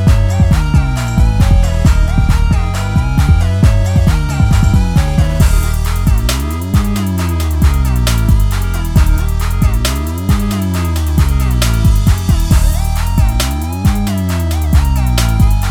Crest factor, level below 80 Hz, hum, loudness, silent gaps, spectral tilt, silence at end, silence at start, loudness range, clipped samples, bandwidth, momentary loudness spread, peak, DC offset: 10 dB; -14 dBFS; none; -13 LUFS; none; -6 dB/octave; 0 s; 0 s; 2 LU; under 0.1%; 18.5 kHz; 4 LU; 0 dBFS; under 0.1%